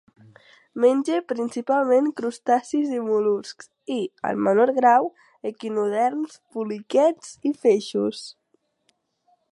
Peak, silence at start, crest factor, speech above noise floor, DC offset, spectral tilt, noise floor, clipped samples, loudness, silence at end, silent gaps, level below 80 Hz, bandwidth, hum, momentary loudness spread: -4 dBFS; 0.75 s; 18 dB; 48 dB; under 0.1%; -5.5 dB/octave; -70 dBFS; under 0.1%; -23 LUFS; 1.2 s; none; -76 dBFS; 11.5 kHz; none; 13 LU